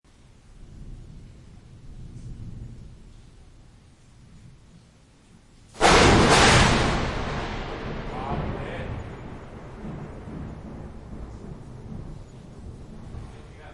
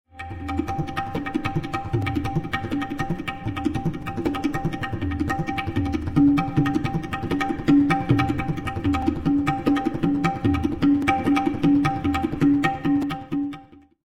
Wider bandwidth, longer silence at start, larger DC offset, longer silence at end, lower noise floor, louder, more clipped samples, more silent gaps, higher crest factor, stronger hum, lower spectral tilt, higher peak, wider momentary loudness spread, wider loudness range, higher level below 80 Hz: about the same, 11.5 kHz vs 12 kHz; first, 0.5 s vs 0.15 s; neither; second, 0 s vs 0.3 s; first, -54 dBFS vs -44 dBFS; about the same, -21 LUFS vs -23 LUFS; neither; neither; about the same, 22 dB vs 18 dB; neither; second, -4 dB/octave vs -7.5 dB/octave; about the same, -4 dBFS vs -4 dBFS; first, 28 LU vs 8 LU; first, 25 LU vs 5 LU; about the same, -36 dBFS vs -40 dBFS